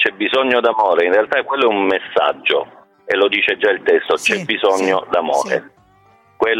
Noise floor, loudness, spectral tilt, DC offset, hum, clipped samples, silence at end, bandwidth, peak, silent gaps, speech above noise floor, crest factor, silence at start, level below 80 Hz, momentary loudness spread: -52 dBFS; -16 LUFS; -3 dB/octave; under 0.1%; none; under 0.1%; 0 s; 13.5 kHz; -2 dBFS; none; 36 dB; 14 dB; 0 s; -62 dBFS; 5 LU